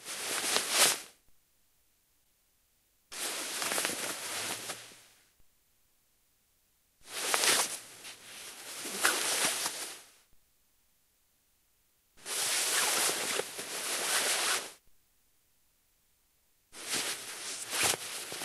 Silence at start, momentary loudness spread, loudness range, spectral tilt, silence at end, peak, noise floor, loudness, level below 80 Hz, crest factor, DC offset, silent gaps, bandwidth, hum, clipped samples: 0 s; 19 LU; 7 LU; 1 dB/octave; 0 s; -6 dBFS; -72 dBFS; -31 LUFS; -78 dBFS; 30 dB; under 0.1%; none; 16 kHz; none; under 0.1%